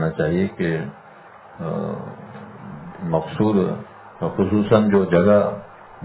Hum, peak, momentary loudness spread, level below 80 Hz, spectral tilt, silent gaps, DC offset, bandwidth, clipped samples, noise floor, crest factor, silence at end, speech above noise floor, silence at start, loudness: none; -2 dBFS; 21 LU; -48 dBFS; -12 dB/octave; none; under 0.1%; 4 kHz; under 0.1%; -44 dBFS; 20 dB; 0 s; 24 dB; 0 s; -20 LUFS